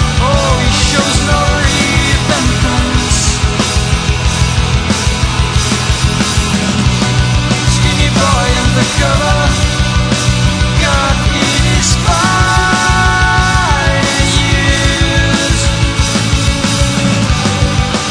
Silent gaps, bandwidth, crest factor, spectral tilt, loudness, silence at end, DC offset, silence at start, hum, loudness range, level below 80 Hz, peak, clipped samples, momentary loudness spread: none; 10.5 kHz; 10 dB; -4 dB/octave; -11 LUFS; 0 s; under 0.1%; 0 s; none; 2 LU; -18 dBFS; 0 dBFS; under 0.1%; 3 LU